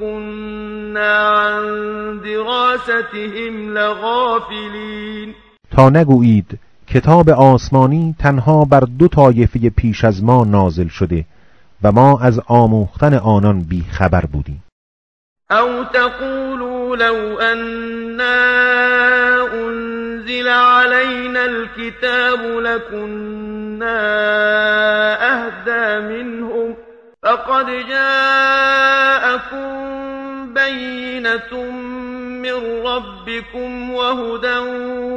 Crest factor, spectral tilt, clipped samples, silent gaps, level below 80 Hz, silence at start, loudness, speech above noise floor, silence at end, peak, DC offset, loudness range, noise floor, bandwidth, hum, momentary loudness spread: 14 dB; -7.5 dB/octave; 0.3%; 14.72-15.36 s; -36 dBFS; 0 s; -14 LUFS; over 76 dB; 0 s; 0 dBFS; under 0.1%; 8 LU; under -90 dBFS; 8.8 kHz; none; 15 LU